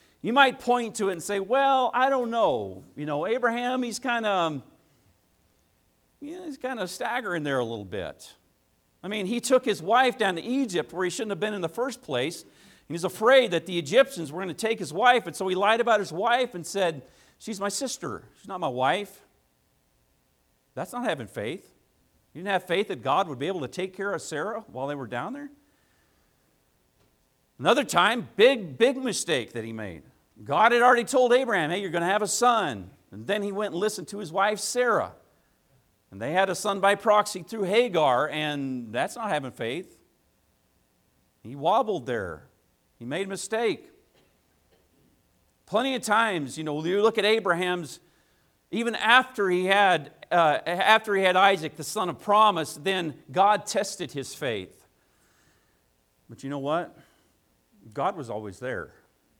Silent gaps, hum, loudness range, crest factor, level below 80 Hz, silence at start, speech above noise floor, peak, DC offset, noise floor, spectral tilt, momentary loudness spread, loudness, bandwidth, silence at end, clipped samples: none; none; 11 LU; 24 dB; -70 dBFS; 0.25 s; 43 dB; -4 dBFS; under 0.1%; -68 dBFS; -3.5 dB/octave; 16 LU; -25 LUFS; 17.5 kHz; 0.5 s; under 0.1%